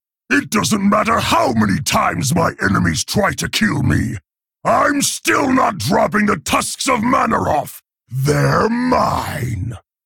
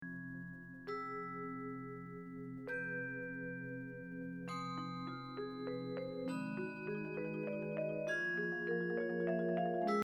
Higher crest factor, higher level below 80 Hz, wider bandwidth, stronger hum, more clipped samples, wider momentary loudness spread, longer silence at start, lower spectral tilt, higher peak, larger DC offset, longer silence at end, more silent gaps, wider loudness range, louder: second, 12 dB vs 18 dB; first, -40 dBFS vs -74 dBFS; first, 18 kHz vs 11 kHz; neither; neither; second, 8 LU vs 11 LU; first, 0.3 s vs 0 s; second, -4.5 dB/octave vs -7 dB/octave; first, -4 dBFS vs -24 dBFS; neither; first, 0.25 s vs 0 s; neither; second, 1 LU vs 6 LU; first, -16 LUFS vs -42 LUFS